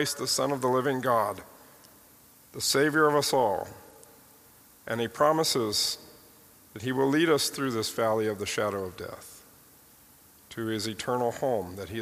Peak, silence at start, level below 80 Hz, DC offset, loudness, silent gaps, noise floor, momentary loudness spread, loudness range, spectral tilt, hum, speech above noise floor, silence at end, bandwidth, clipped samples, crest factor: -8 dBFS; 0 s; -66 dBFS; under 0.1%; -27 LUFS; none; -56 dBFS; 18 LU; 6 LU; -3.5 dB/octave; none; 29 dB; 0 s; 15.5 kHz; under 0.1%; 20 dB